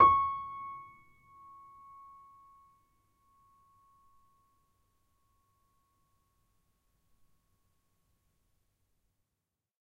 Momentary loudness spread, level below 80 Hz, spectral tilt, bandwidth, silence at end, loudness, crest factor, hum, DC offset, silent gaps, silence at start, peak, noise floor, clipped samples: 26 LU; -68 dBFS; -6.5 dB/octave; 4.7 kHz; 9.05 s; -31 LUFS; 28 dB; none; under 0.1%; none; 0 s; -10 dBFS; -88 dBFS; under 0.1%